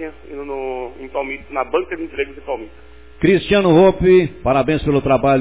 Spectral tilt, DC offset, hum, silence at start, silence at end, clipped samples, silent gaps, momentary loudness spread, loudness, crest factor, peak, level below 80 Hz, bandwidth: -11 dB/octave; 0.8%; none; 0 s; 0 s; under 0.1%; none; 16 LU; -17 LUFS; 14 dB; -2 dBFS; -38 dBFS; 4 kHz